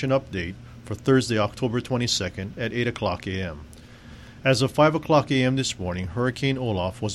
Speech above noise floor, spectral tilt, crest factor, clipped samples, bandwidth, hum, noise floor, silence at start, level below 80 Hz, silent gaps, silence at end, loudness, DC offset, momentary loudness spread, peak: 21 dB; -5.5 dB/octave; 18 dB; under 0.1%; 13 kHz; none; -44 dBFS; 0 s; -48 dBFS; none; 0 s; -24 LUFS; under 0.1%; 13 LU; -6 dBFS